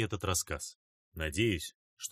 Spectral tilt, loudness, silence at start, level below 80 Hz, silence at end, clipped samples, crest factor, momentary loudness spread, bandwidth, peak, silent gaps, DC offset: -3.5 dB/octave; -35 LUFS; 0 s; -50 dBFS; 0 s; under 0.1%; 20 dB; 13 LU; 15.5 kHz; -16 dBFS; 0.75-1.12 s, 1.75-1.97 s; under 0.1%